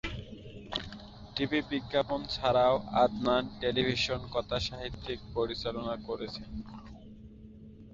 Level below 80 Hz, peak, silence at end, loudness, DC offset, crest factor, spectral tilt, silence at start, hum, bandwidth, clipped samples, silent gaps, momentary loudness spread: -50 dBFS; -12 dBFS; 0 s; -32 LUFS; under 0.1%; 20 dB; -5.5 dB/octave; 0.05 s; none; 7.8 kHz; under 0.1%; none; 22 LU